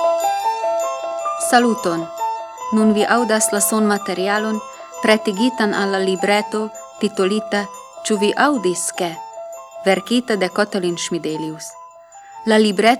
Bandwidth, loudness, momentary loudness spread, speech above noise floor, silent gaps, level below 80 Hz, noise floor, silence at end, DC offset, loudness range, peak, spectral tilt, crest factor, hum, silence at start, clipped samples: 17 kHz; -18 LUFS; 12 LU; 24 dB; none; -68 dBFS; -41 dBFS; 0 s; under 0.1%; 3 LU; 0 dBFS; -3.5 dB/octave; 18 dB; none; 0 s; under 0.1%